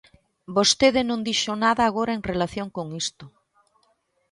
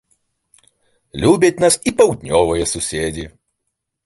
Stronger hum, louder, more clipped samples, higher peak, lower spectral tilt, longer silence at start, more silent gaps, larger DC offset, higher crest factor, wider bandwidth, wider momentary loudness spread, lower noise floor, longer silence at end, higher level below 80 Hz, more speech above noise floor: neither; second, -23 LUFS vs -16 LUFS; neither; about the same, -4 dBFS vs -2 dBFS; about the same, -3 dB/octave vs -4 dB/octave; second, 0.5 s vs 1.15 s; neither; neither; about the same, 20 dB vs 18 dB; about the same, 11.5 kHz vs 12 kHz; second, 12 LU vs 15 LU; second, -68 dBFS vs -76 dBFS; first, 1.05 s vs 0.8 s; second, -54 dBFS vs -40 dBFS; second, 45 dB vs 60 dB